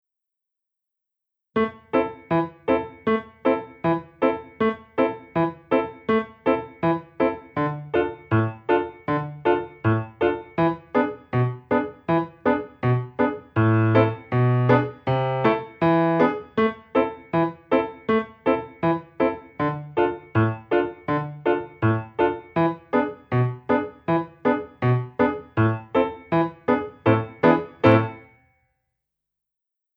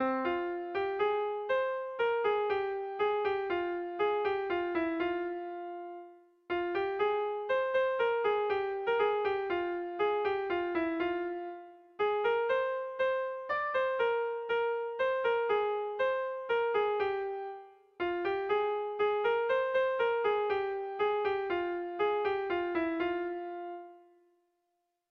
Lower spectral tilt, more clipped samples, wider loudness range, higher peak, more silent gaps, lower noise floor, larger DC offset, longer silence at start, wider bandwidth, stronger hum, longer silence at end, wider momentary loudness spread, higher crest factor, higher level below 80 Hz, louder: first, -10 dB/octave vs -6 dB/octave; neither; about the same, 3 LU vs 3 LU; first, -2 dBFS vs -18 dBFS; neither; first, -85 dBFS vs -81 dBFS; neither; first, 1.55 s vs 0 s; about the same, 5.6 kHz vs 6 kHz; first, 50 Hz at -55 dBFS vs none; first, 1.75 s vs 1.1 s; second, 5 LU vs 8 LU; first, 20 dB vs 14 dB; first, -56 dBFS vs -68 dBFS; first, -23 LUFS vs -32 LUFS